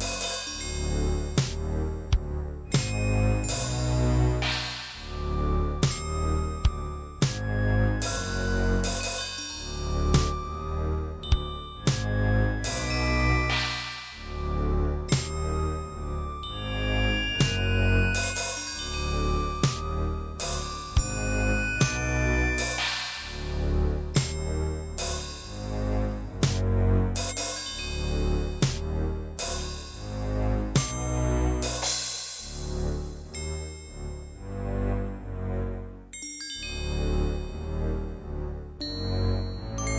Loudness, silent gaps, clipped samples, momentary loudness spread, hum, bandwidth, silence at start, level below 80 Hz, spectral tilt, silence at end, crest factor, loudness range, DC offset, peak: -29 LUFS; none; under 0.1%; 10 LU; none; 8 kHz; 0 s; -32 dBFS; -4.5 dB/octave; 0 s; 18 dB; 6 LU; under 0.1%; -10 dBFS